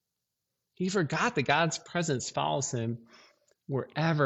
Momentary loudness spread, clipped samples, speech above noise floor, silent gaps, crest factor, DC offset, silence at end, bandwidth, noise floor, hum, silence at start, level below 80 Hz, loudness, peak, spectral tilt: 9 LU; under 0.1%; 56 dB; none; 20 dB; under 0.1%; 0 s; 8.4 kHz; -85 dBFS; none; 0.8 s; -68 dBFS; -30 LUFS; -10 dBFS; -4.5 dB/octave